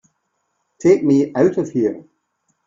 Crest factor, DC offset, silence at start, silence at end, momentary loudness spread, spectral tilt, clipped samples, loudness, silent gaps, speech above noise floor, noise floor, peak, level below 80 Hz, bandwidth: 16 dB; under 0.1%; 0.8 s; 0.65 s; 8 LU; -7.5 dB/octave; under 0.1%; -17 LUFS; none; 55 dB; -71 dBFS; -2 dBFS; -60 dBFS; 7.6 kHz